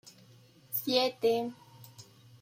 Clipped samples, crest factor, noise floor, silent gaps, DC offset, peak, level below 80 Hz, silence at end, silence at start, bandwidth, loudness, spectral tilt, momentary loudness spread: under 0.1%; 22 dB; -59 dBFS; none; under 0.1%; -12 dBFS; -78 dBFS; 0.4 s; 0.05 s; 16.5 kHz; -31 LUFS; -3.5 dB/octave; 24 LU